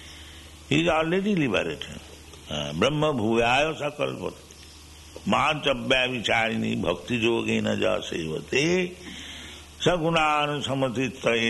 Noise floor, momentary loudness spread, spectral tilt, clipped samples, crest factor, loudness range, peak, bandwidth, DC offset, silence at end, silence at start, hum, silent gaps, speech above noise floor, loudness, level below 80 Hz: -46 dBFS; 20 LU; -4.5 dB/octave; under 0.1%; 18 dB; 2 LU; -8 dBFS; 12 kHz; under 0.1%; 0 s; 0 s; none; none; 22 dB; -25 LUFS; -48 dBFS